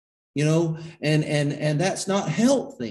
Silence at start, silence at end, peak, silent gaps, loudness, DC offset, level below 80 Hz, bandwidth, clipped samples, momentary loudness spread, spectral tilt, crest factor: 0.35 s; 0 s; -8 dBFS; none; -23 LUFS; under 0.1%; -62 dBFS; 12.5 kHz; under 0.1%; 6 LU; -5.5 dB/octave; 16 dB